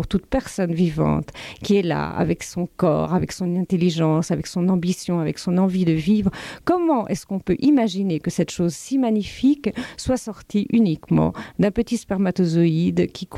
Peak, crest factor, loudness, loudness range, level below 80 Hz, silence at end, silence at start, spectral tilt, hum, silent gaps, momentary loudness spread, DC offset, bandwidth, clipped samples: -6 dBFS; 14 dB; -21 LUFS; 1 LU; -44 dBFS; 0 s; 0 s; -7 dB/octave; none; none; 7 LU; under 0.1%; 13.5 kHz; under 0.1%